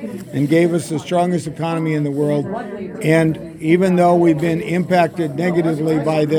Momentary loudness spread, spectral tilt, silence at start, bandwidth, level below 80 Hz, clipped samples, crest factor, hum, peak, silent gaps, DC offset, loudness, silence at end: 9 LU; -7 dB/octave; 0 s; 15.5 kHz; -54 dBFS; under 0.1%; 16 dB; none; 0 dBFS; none; under 0.1%; -17 LUFS; 0 s